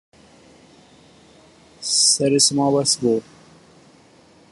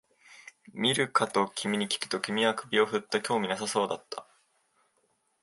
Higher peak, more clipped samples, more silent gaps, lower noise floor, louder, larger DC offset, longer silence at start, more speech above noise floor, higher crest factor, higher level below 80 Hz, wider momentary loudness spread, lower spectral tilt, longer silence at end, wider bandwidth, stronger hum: first, -2 dBFS vs -10 dBFS; neither; neither; second, -51 dBFS vs -73 dBFS; first, -17 LUFS vs -29 LUFS; neither; first, 1.8 s vs 0.3 s; second, 33 dB vs 44 dB; about the same, 20 dB vs 22 dB; first, -62 dBFS vs -76 dBFS; second, 8 LU vs 16 LU; about the same, -3 dB/octave vs -3.5 dB/octave; about the same, 1.3 s vs 1.2 s; about the same, 11.5 kHz vs 12 kHz; neither